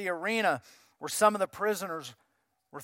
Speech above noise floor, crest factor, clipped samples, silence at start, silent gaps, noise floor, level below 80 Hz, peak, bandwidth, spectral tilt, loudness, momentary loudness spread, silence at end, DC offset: 37 dB; 22 dB; under 0.1%; 0 s; none; -67 dBFS; -78 dBFS; -10 dBFS; 16.5 kHz; -3 dB/octave; -30 LUFS; 17 LU; 0 s; under 0.1%